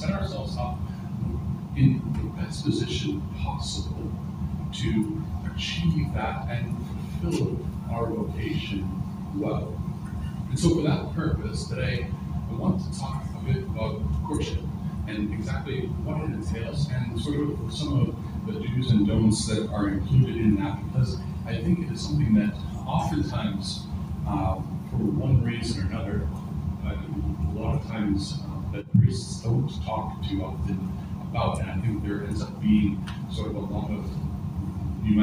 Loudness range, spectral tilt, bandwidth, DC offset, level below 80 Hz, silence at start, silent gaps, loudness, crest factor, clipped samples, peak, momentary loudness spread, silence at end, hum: 5 LU; -7 dB/octave; 15.5 kHz; under 0.1%; -38 dBFS; 0 s; none; -28 LUFS; 18 dB; under 0.1%; -8 dBFS; 9 LU; 0 s; none